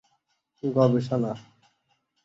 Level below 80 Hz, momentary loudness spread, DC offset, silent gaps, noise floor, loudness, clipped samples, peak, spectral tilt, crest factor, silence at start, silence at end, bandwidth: -64 dBFS; 12 LU; under 0.1%; none; -73 dBFS; -25 LUFS; under 0.1%; -8 dBFS; -9 dB/octave; 20 dB; 0.65 s; 0.85 s; 7.8 kHz